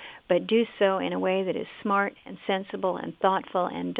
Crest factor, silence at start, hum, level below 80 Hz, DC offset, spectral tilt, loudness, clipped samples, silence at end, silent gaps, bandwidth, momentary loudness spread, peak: 18 dB; 0 s; none; -70 dBFS; under 0.1%; -8.5 dB/octave; -27 LUFS; under 0.1%; 0 s; none; 4.8 kHz; 7 LU; -8 dBFS